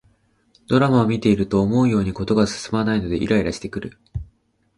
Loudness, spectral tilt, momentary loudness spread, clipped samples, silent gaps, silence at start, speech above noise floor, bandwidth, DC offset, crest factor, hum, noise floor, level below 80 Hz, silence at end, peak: -20 LUFS; -7 dB/octave; 15 LU; under 0.1%; none; 0.7 s; 41 dB; 11 kHz; under 0.1%; 18 dB; none; -60 dBFS; -42 dBFS; 0.55 s; -4 dBFS